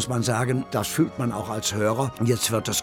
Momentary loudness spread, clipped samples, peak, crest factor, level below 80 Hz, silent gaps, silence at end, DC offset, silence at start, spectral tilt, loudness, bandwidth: 4 LU; under 0.1%; -10 dBFS; 14 dB; -56 dBFS; none; 0 s; under 0.1%; 0 s; -4.5 dB/octave; -24 LUFS; 17.5 kHz